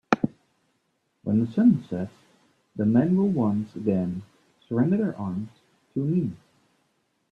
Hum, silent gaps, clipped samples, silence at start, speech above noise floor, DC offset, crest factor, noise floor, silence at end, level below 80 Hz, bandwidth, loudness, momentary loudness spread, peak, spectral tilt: none; none; under 0.1%; 0.1 s; 49 dB; under 0.1%; 24 dB; -73 dBFS; 0.95 s; -64 dBFS; 6.8 kHz; -25 LUFS; 14 LU; -2 dBFS; -9 dB/octave